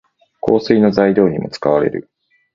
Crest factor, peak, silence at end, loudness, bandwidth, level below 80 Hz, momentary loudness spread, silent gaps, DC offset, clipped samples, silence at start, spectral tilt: 16 dB; 0 dBFS; 0.55 s; -15 LUFS; 7.4 kHz; -50 dBFS; 9 LU; none; under 0.1%; under 0.1%; 0.45 s; -8 dB/octave